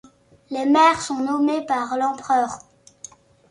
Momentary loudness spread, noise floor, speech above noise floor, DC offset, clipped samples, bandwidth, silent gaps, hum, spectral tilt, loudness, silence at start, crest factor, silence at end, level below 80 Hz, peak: 25 LU; -45 dBFS; 26 dB; under 0.1%; under 0.1%; 11 kHz; none; none; -3.5 dB/octave; -20 LUFS; 0.5 s; 16 dB; 0.9 s; -62 dBFS; -6 dBFS